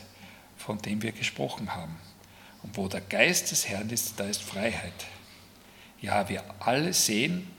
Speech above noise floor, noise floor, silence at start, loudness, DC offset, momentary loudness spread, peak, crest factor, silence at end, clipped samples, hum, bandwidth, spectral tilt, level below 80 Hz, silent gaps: 23 dB; -53 dBFS; 0 s; -28 LUFS; under 0.1%; 20 LU; -4 dBFS; 26 dB; 0 s; under 0.1%; none; 18 kHz; -3 dB/octave; -66 dBFS; none